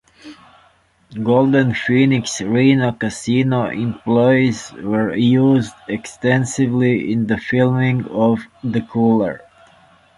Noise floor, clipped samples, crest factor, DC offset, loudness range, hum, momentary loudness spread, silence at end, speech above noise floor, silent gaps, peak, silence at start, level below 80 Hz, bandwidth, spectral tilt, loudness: -55 dBFS; under 0.1%; 16 dB; under 0.1%; 2 LU; none; 9 LU; 0.8 s; 39 dB; none; -2 dBFS; 0.25 s; -52 dBFS; 11.5 kHz; -6.5 dB/octave; -17 LUFS